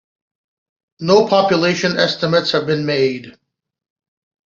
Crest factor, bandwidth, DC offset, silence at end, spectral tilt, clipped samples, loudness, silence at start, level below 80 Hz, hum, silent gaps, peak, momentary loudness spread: 16 dB; 7.6 kHz; under 0.1%; 1.15 s; -5 dB/octave; under 0.1%; -16 LUFS; 1 s; -58 dBFS; none; none; -2 dBFS; 6 LU